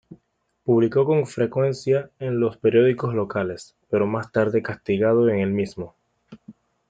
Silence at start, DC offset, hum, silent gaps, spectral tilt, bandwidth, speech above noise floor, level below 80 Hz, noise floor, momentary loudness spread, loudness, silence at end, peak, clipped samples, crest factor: 0.1 s; under 0.1%; none; none; -8 dB/octave; 9.2 kHz; 48 dB; -62 dBFS; -69 dBFS; 10 LU; -22 LUFS; 0.4 s; -6 dBFS; under 0.1%; 16 dB